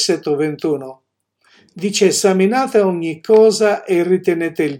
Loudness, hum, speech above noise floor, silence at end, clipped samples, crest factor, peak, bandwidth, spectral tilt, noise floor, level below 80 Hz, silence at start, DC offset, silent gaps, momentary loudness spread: -15 LUFS; none; 44 dB; 0 s; under 0.1%; 14 dB; 0 dBFS; 16.5 kHz; -4.5 dB/octave; -59 dBFS; -70 dBFS; 0 s; under 0.1%; none; 10 LU